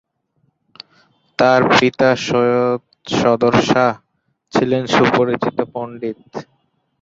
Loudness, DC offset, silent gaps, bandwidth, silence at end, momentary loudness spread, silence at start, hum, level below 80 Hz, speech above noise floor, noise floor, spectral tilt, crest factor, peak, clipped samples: -16 LUFS; under 0.1%; none; 7.8 kHz; 0.6 s; 14 LU; 1.4 s; none; -54 dBFS; 49 dB; -65 dBFS; -5.5 dB/octave; 16 dB; 0 dBFS; under 0.1%